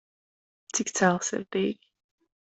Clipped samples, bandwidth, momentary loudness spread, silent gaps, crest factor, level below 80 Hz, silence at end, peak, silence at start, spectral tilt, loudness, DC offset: under 0.1%; 8.4 kHz; 8 LU; none; 24 dB; -70 dBFS; 0.8 s; -6 dBFS; 0.75 s; -4 dB/octave; -27 LUFS; under 0.1%